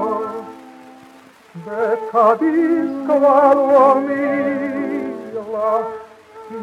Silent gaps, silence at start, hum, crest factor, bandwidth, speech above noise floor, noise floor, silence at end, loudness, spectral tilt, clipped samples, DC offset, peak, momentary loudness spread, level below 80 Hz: none; 0 s; none; 16 dB; 9.8 kHz; 30 dB; -45 dBFS; 0 s; -16 LUFS; -7 dB/octave; under 0.1%; under 0.1%; -2 dBFS; 17 LU; -70 dBFS